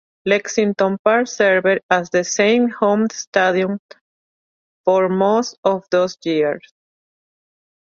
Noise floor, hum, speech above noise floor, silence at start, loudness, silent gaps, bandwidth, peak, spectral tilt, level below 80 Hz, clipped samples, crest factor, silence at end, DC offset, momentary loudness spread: under -90 dBFS; none; over 73 dB; 0.25 s; -17 LUFS; 0.99-1.05 s, 1.83-1.89 s, 3.27-3.32 s, 3.79-3.89 s, 4.01-4.84 s, 5.58-5.63 s; 7.6 kHz; -2 dBFS; -4.5 dB/octave; -64 dBFS; under 0.1%; 18 dB; 1.25 s; under 0.1%; 5 LU